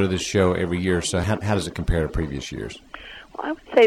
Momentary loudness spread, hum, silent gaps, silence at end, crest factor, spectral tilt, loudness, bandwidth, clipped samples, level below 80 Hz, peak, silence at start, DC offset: 16 LU; none; none; 0 s; 16 dB; -5.5 dB/octave; -24 LUFS; 16 kHz; under 0.1%; -34 dBFS; -6 dBFS; 0 s; under 0.1%